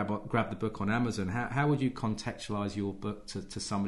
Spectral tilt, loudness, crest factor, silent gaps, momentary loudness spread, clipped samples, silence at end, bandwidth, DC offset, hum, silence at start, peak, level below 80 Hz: -6 dB/octave; -33 LUFS; 16 dB; none; 9 LU; under 0.1%; 0 s; 11.5 kHz; under 0.1%; none; 0 s; -16 dBFS; -54 dBFS